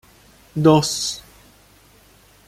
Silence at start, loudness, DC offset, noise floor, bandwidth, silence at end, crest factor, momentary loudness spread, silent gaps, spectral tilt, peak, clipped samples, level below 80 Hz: 0.55 s; -18 LUFS; under 0.1%; -52 dBFS; 15.5 kHz; 1.25 s; 20 dB; 17 LU; none; -5 dB/octave; -2 dBFS; under 0.1%; -54 dBFS